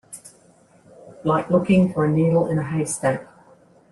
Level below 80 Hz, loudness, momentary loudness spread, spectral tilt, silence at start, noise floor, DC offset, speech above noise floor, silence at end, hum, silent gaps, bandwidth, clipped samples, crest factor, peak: -52 dBFS; -21 LUFS; 12 LU; -7 dB/octave; 0.1 s; -54 dBFS; under 0.1%; 35 dB; 0.7 s; none; none; 12.5 kHz; under 0.1%; 16 dB; -6 dBFS